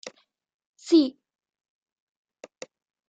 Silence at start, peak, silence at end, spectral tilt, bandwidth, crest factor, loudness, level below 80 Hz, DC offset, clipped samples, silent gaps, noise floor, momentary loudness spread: 0.05 s; -8 dBFS; 2 s; -3.5 dB/octave; 8.6 kHz; 20 dB; -22 LUFS; -82 dBFS; under 0.1%; under 0.1%; 0.54-0.59 s, 0.66-0.73 s; -48 dBFS; 24 LU